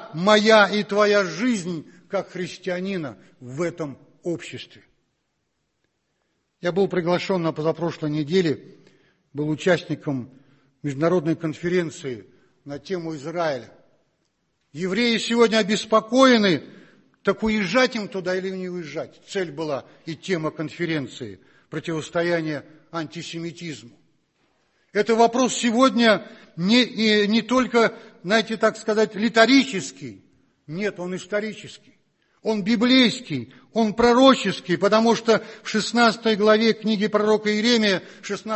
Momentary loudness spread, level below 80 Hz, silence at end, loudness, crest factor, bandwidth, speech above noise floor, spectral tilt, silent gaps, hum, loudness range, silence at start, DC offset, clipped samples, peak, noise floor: 17 LU; -60 dBFS; 0 s; -21 LUFS; 20 dB; 8.6 kHz; 53 dB; -4.5 dB/octave; none; none; 10 LU; 0 s; under 0.1%; under 0.1%; -2 dBFS; -74 dBFS